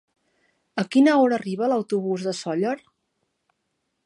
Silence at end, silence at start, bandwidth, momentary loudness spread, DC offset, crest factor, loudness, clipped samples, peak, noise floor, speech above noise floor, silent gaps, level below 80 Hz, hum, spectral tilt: 1.3 s; 0.75 s; 11 kHz; 12 LU; under 0.1%; 16 dB; -22 LUFS; under 0.1%; -8 dBFS; -76 dBFS; 55 dB; none; -76 dBFS; none; -6 dB/octave